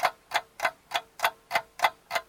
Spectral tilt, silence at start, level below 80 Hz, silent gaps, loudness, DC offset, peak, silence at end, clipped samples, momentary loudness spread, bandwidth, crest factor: 0 dB/octave; 0 s; -70 dBFS; none; -30 LUFS; under 0.1%; -8 dBFS; 0.05 s; under 0.1%; 5 LU; 18 kHz; 24 dB